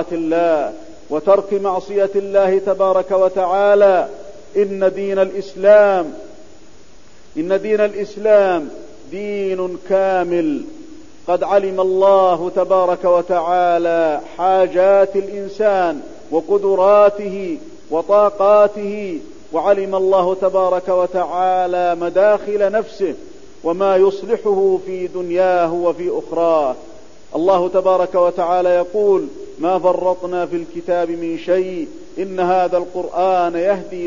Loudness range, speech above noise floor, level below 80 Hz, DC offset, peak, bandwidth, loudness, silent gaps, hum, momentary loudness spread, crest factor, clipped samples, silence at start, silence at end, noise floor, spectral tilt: 4 LU; 31 dB; -54 dBFS; 1%; -2 dBFS; 7.4 kHz; -16 LUFS; none; none; 12 LU; 14 dB; under 0.1%; 0 s; 0 s; -47 dBFS; -6.5 dB/octave